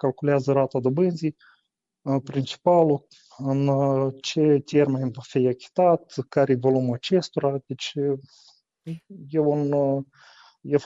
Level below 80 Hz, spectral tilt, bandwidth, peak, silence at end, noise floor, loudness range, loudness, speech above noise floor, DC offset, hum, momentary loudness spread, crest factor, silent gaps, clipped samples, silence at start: -68 dBFS; -7 dB/octave; 7.8 kHz; -8 dBFS; 0 s; -72 dBFS; 4 LU; -23 LUFS; 49 dB; under 0.1%; none; 11 LU; 16 dB; none; under 0.1%; 0.05 s